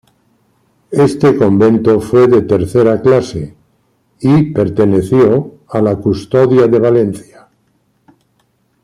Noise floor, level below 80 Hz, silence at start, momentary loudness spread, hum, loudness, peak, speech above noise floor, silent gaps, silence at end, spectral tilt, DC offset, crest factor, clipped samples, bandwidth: -59 dBFS; -44 dBFS; 0.9 s; 9 LU; none; -11 LUFS; -2 dBFS; 49 dB; none; 1.6 s; -8.5 dB/octave; under 0.1%; 10 dB; under 0.1%; 12 kHz